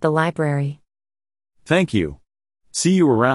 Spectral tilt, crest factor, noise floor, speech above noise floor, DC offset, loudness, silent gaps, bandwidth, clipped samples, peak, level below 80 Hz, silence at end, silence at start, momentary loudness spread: -5.5 dB/octave; 18 dB; under -90 dBFS; over 72 dB; under 0.1%; -20 LUFS; none; 11.5 kHz; under 0.1%; -2 dBFS; -50 dBFS; 0 s; 0 s; 13 LU